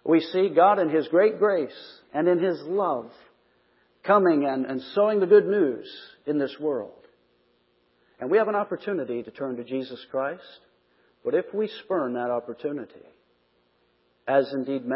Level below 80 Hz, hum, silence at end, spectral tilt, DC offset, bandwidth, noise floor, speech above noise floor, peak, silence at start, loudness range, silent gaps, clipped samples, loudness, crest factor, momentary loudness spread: -78 dBFS; 60 Hz at -65 dBFS; 0 s; -10.5 dB/octave; under 0.1%; 5.8 kHz; -67 dBFS; 43 dB; -6 dBFS; 0.05 s; 8 LU; none; under 0.1%; -24 LUFS; 20 dB; 16 LU